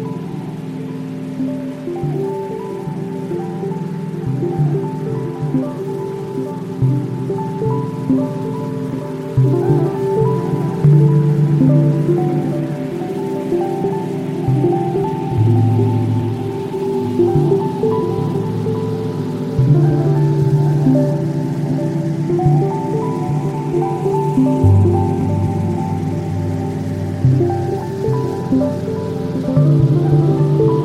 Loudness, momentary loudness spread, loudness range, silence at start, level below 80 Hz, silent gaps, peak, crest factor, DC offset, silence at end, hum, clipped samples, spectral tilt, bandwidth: -17 LUFS; 10 LU; 6 LU; 0 s; -44 dBFS; none; -2 dBFS; 14 dB; under 0.1%; 0 s; none; under 0.1%; -9.5 dB/octave; 10.5 kHz